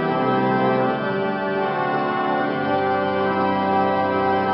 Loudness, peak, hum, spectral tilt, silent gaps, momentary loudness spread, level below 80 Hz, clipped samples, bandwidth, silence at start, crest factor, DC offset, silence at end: -21 LUFS; -8 dBFS; none; -11 dB/octave; none; 3 LU; -60 dBFS; under 0.1%; 5.8 kHz; 0 s; 12 dB; under 0.1%; 0 s